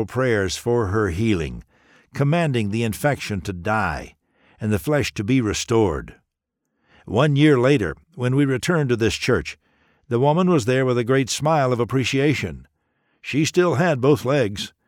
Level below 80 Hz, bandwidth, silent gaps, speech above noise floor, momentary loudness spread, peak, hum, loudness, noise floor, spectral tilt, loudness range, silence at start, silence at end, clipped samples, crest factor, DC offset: -44 dBFS; 17 kHz; none; 58 dB; 9 LU; -4 dBFS; none; -20 LUFS; -78 dBFS; -6 dB/octave; 3 LU; 0 s; 0.2 s; under 0.1%; 16 dB; under 0.1%